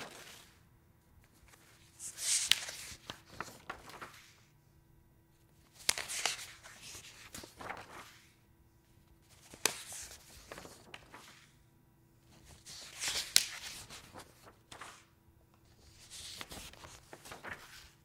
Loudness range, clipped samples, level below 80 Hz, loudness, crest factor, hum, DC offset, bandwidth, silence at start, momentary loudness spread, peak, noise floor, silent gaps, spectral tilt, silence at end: 13 LU; under 0.1%; -68 dBFS; -38 LUFS; 40 dB; none; under 0.1%; 16 kHz; 0 s; 25 LU; -4 dBFS; -66 dBFS; none; 0.5 dB/octave; 0.1 s